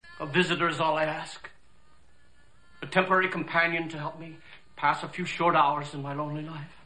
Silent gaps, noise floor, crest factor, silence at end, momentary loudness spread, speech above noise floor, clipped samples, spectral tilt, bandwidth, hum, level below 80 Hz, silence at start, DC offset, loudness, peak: none; -62 dBFS; 22 dB; 0.2 s; 17 LU; 34 dB; under 0.1%; -5 dB/octave; 10 kHz; none; -64 dBFS; 0 s; 0.3%; -27 LUFS; -8 dBFS